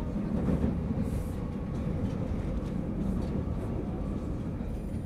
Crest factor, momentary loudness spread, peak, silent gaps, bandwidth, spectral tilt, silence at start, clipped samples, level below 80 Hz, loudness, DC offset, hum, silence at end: 18 dB; 5 LU; -14 dBFS; none; 13 kHz; -9 dB/octave; 0 s; under 0.1%; -38 dBFS; -33 LUFS; under 0.1%; none; 0 s